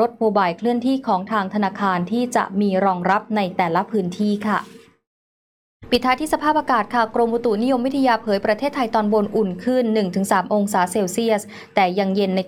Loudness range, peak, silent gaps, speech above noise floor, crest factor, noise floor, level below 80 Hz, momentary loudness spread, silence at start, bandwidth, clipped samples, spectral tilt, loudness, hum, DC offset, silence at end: 3 LU; -4 dBFS; 5.07-5.80 s; over 71 dB; 16 dB; under -90 dBFS; -56 dBFS; 3 LU; 0 s; 16.5 kHz; under 0.1%; -5.5 dB/octave; -20 LUFS; none; under 0.1%; 0 s